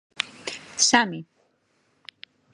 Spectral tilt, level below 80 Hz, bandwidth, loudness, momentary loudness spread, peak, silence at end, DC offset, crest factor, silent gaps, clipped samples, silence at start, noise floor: -1 dB/octave; -72 dBFS; 11.5 kHz; -22 LUFS; 25 LU; 0 dBFS; 1.3 s; under 0.1%; 28 dB; none; under 0.1%; 0.2 s; -68 dBFS